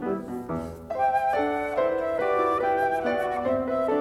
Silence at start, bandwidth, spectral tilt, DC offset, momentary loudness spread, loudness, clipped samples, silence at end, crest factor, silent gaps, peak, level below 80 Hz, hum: 0 s; 15 kHz; -6.5 dB/octave; under 0.1%; 9 LU; -26 LUFS; under 0.1%; 0 s; 12 dB; none; -12 dBFS; -56 dBFS; none